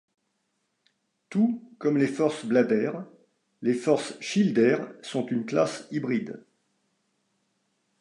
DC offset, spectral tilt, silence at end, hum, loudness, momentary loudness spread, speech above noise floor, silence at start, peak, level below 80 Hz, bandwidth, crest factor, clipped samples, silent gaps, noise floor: under 0.1%; -6 dB/octave; 1.6 s; none; -26 LUFS; 9 LU; 51 dB; 1.3 s; -8 dBFS; -78 dBFS; 11 kHz; 18 dB; under 0.1%; none; -76 dBFS